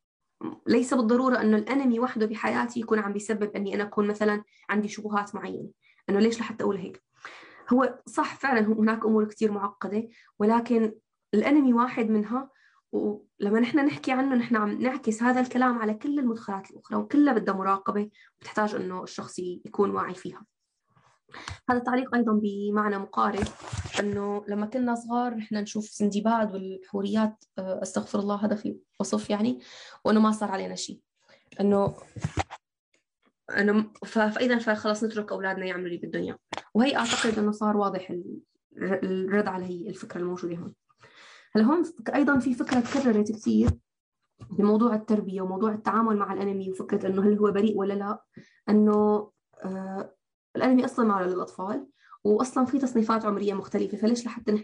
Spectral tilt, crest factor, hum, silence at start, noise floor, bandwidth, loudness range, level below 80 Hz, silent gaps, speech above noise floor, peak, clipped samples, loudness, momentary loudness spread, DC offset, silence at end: -6 dB/octave; 14 dB; none; 0.4 s; -68 dBFS; 10.5 kHz; 4 LU; -56 dBFS; 32.79-32.92 s, 38.64-38.70 s, 44.00-44.12 s, 50.34-50.54 s; 42 dB; -12 dBFS; under 0.1%; -27 LUFS; 13 LU; under 0.1%; 0 s